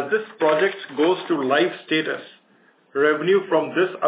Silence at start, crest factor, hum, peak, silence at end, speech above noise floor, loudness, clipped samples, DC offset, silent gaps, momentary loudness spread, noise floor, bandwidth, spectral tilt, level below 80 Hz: 0 s; 16 dB; none; -6 dBFS; 0 s; 37 dB; -21 LUFS; under 0.1%; under 0.1%; none; 5 LU; -58 dBFS; 4 kHz; -9 dB/octave; -82 dBFS